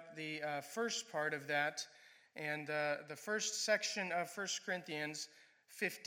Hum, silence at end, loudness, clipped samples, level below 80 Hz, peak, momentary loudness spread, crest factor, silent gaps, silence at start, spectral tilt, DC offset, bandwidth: none; 0 s; -40 LUFS; under 0.1%; under -90 dBFS; -20 dBFS; 11 LU; 22 dB; none; 0 s; -2 dB/octave; under 0.1%; 17 kHz